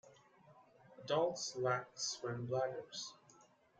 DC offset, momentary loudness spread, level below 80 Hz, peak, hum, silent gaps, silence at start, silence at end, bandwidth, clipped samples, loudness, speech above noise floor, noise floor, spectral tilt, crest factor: under 0.1%; 11 LU; -82 dBFS; -22 dBFS; none; none; 0.05 s; 0.35 s; 9.6 kHz; under 0.1%; -40 LUFS; 28 dB; -68 dBFS; -3.5 dB/octave; 20 dB